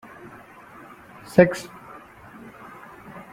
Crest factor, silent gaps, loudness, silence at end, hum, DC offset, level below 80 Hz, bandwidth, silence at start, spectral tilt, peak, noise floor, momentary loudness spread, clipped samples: 26 dB; none; -20 LUFS; 1.7 s; none; under 0.1%; -60 dBFS; 16 kHz; 1.35 s; -7 dB/octave; -2 dBFS; -46 dBFS; 27 LU; under 0.1%